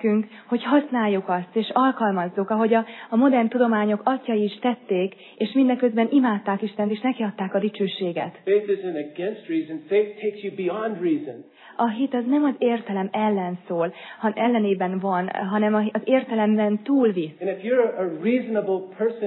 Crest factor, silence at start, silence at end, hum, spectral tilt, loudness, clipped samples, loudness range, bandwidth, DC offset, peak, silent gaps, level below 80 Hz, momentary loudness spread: 16 dB; 0 s; 0 s; none; -10.5 dB/octave; -23 LUFS; under 0.1%; 4 LU; 4.2 kHz; under 0.1%; -6 dBFS; none; -88 dBFS; 8 LU